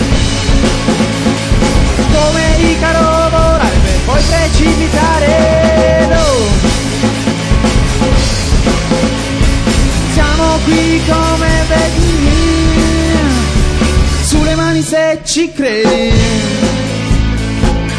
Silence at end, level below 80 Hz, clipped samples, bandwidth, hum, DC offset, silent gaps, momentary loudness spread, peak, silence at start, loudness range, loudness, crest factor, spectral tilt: 0 s; -14 dBFS; under 0.1%; 11 kHz; none; under 0.1%; none; 4 LU; 0 dBFS; 0 s; 2 LU; -11 LUFS; 10 dB; -5 dB/octave